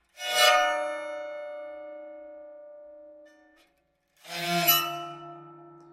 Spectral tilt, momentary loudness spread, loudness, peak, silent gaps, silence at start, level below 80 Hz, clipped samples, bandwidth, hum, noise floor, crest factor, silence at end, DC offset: -1.5 dB/octave; 27 LU; -25 LUFS; -8 dBFS; none; 0.15 s; -76 dBFS; under 0.1%; 16.5 kHz; none; -71 dBFS; 24 dB; 0.1 s; under 0.1%